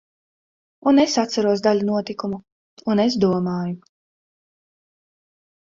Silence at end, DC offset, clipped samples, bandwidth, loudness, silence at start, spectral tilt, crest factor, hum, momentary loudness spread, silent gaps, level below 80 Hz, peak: 1.9 s; under 0.1%; under 0.1%; 7.6 kHz; -20 LUFS; 0.85 s; -5.5 dB/octave; 18 dB; none; 13 LU; 2.52-2.77 s; -60 dBFS; -6 dBFS